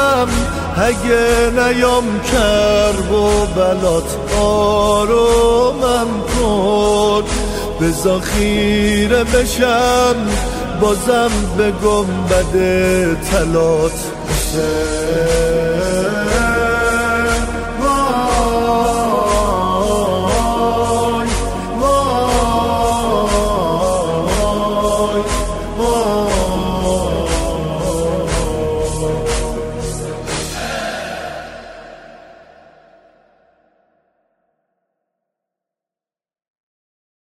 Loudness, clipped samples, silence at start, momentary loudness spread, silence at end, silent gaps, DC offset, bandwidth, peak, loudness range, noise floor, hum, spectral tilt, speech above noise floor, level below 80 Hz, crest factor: -15 LUFS; under 0.1%; 0 s; 7 LU; 5.15 s; none; under 0.1%; 16 kHz; -2 dBFS; 6 LU; under -90 dBFS; none; -4.5 dB/octave; over 76 dB; -26 dBFS; 14 dB